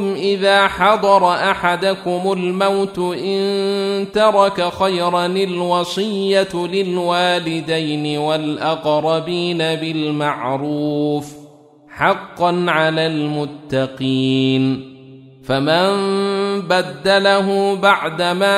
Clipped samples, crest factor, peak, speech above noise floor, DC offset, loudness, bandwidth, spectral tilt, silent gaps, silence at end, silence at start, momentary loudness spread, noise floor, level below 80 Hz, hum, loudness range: under 0.1%; 16 dB; -2 dBFS; 27 dB; under 0.1%; -17 LUFS; 14.5 kHz; -5.5 dB/octave; none; 0 s; 0 s; 7 LU; -44 dBFS; -54 dBFS; none; 3 LU